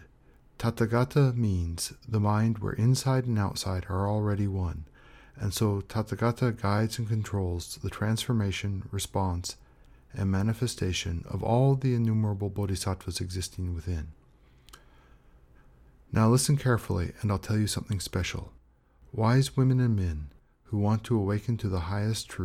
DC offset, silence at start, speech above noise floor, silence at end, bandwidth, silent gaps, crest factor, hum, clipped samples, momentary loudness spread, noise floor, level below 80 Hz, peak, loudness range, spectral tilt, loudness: under 0.1%; 0 s; 32 dB; 0 s; 15.5 kHz; none; 16 dB; none; under 0.1%; 10 LU; -60 dBFS; -48 dBFS; -14 dBFS; 4 LU; -6 dB/octave; -29 LUFS